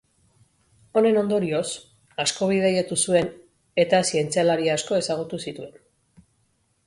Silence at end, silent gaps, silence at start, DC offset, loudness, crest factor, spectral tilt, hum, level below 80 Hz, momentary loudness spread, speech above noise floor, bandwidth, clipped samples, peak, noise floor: 1.15 s; none; 0.95 s; under 0.1%; -23 LUFS; 18 dB; -4 dB/octave; none; -62 dBFS; 13 LU; 46 dB; 11.5 kHz; under 0.1%; -6 dBFS; -68 dBFS